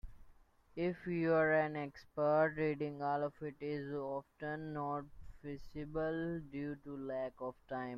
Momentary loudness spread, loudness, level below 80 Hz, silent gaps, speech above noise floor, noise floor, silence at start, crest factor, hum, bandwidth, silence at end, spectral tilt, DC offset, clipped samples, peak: 15 LU; -39 LUFS; -62 dBFS; none; 26 dB; -64 dBFS; 0.05 s; 18 dB; none; 6.6 kHz; 0 s; -9 dB/octave; under 0.1%; under 0.1%; -22 dBFS